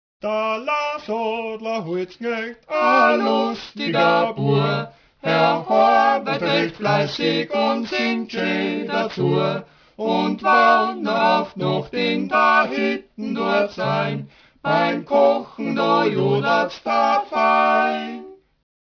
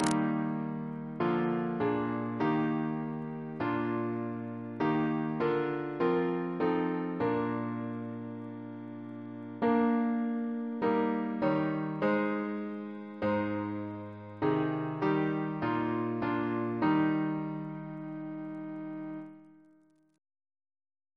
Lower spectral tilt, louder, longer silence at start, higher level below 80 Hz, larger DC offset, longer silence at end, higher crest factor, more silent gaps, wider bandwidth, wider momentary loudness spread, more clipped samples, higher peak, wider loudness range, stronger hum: about the same, -6.5 dB/octave vs -7.5 dB/octave; first, -20 LUFS vs -32 LUFS; first, 0.25 s vs 0 s; first, -62 dBFS vs -70 dBFS; neither; second, 0.5 s vs 1.65 s; about the same, 16 dB vs 20 dB; neither; second, 5.4 kHz vs 11 kHz; about the same, 10 LU vs 12 LU; neither; first, -4 dBFS vs -12 dBFS; about the same, 3 LU vs 4 LU; neither